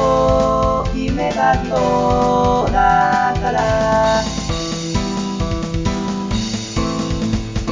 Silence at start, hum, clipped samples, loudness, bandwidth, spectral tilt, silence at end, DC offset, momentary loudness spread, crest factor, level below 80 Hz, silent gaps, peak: 0 s; none; under 0.1%; -17 LUFS; 7.6 kHz; -5.5 dB/octave; 0 s; 0.1%; 7 LU; 14 dB; -28 dBFS; none; -2 dBFS